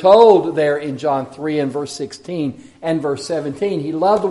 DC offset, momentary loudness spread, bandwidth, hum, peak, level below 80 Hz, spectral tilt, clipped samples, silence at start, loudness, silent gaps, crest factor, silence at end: under 0.1%; 15 LU; 11.5 kHz; none; 0 dBFS; -60 dBFS; -6 dB/octave; under 0.1%; 0 s; -18 LUFS; none; 16 dB; 0 s